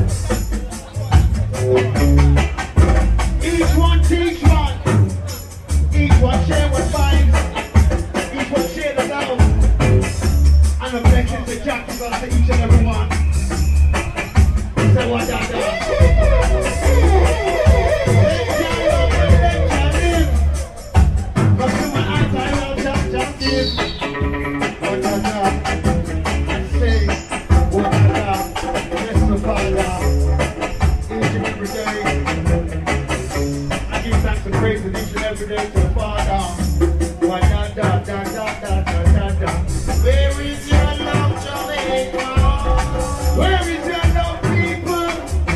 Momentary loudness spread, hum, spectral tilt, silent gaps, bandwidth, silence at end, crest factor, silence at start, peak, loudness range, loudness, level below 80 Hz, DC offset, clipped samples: 7 LU; none; -6 dB/octave; none; 12.5 kHz; 0 s; 16 dB; 0 s; 0 dBFS; 4 LU; -17 LUFS; -18 dBFS; under 0.1%; under 0.1%